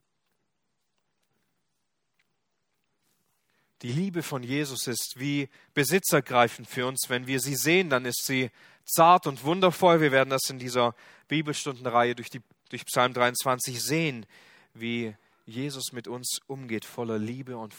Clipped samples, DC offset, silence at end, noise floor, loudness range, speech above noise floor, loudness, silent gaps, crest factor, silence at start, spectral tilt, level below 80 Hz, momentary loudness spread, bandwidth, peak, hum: under 0.1%; under 0.1%; 0 s; -81 dBFS; 11 LU; 54 dB; -26 LUFS; none; 24 dB; 3.8 s; -4 dB/octave; -72 dBFS; 14 LU; over 20 kHz; -4 dBFS; none